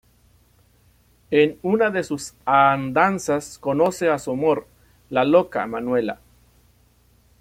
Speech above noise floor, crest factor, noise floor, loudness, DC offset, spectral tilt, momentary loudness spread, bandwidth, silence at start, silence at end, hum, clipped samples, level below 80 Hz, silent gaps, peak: 38 dB; 20 dB; -58 dBFS; -21 LUFS; under 0.1%; -5.5 dB/octave; 9 LU; 16 kHz; 1.3 s; 1.25 s; 60 Hz at -55 dBFS; under 0.1%; -58 dBFS; none; -2 dBFS